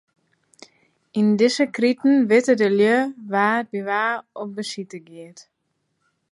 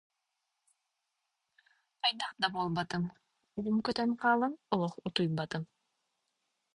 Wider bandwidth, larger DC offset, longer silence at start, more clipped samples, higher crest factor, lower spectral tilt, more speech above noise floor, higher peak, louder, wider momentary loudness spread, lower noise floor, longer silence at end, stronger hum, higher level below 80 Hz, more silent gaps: about the same, 11.5 kHz vs 11 kHz; neither; second, 1.15 s vs 2.05 s; neither; about the same, 18 dB vs 22 dB; about the same, -5 dB/octave vs -5.5 dB/octave; about the same, 53 dB vs 52 dB; first, -4 dBFS vs -12 dBFS; first, -20 LUFS vs -33 LUFS; first, 16 LU vs 11 LU; second, -73 dBFS vs -84 dBFS; second, 0.9 s vs 1.1 s; neither; second, -76 dBFS vs -70 dBFS; neither